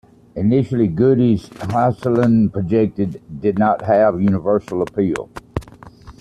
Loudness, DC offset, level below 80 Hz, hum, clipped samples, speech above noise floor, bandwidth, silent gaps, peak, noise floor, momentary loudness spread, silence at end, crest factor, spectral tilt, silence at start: -17 LUFS; under 0.1%; -46 dBFS; none; under 0.1%; 24 dB; 10.5 kHz; none; -4 dBFS; -40 dBFS; 11 LU; 0.1 s; 14 dB; -9 dB/octave; 0.35 s